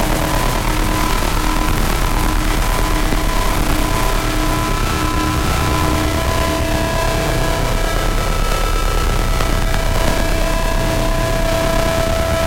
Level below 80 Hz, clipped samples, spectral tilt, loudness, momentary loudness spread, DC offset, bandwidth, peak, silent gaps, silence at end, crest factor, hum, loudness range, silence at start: -18 dBFS; under 0.1%; -4.5 dB/octave; -18 LUFS; 2 LU; under 0.1%; 17 kHz; 0 dBFS; none; 0 s; 14 dB; none; 1 LU; 0 s